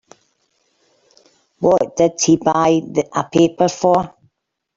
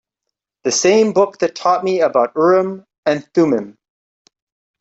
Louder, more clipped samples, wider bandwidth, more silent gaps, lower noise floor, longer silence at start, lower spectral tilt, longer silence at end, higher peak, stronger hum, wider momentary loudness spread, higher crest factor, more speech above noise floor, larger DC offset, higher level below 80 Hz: about the same, -16 LUFS vs -16 LUFS; neither; about the same, 7.8 kHz vs 8 kHz; second, none vs 2.98-3.03 s; second, -67 dBFS vs -80 dBFS; first, 1.6 s vs 0.65 s; about the same, -5 dB/octave vs -4 dB/octave; second, 0.7 s vs 1.1 s; about the same, -2 dBFS vs -2 dBFS; neither; second, 6 LU vs 9 LU; about the same, 16 dB vs 16 dB; second, 51 dB vs 65 dB; neither; first, -54 dBFS vs -64 dBFS